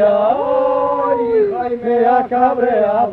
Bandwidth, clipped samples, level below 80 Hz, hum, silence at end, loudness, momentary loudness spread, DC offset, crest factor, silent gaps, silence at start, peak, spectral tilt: 4.8 kHz; under 0.1%; -52 dBFS; none; 0 s; -15 LUFS; 3 LU; under 0.1%; 12 dB; none; 0 s; -2 dBFS; -8.5 dB/octave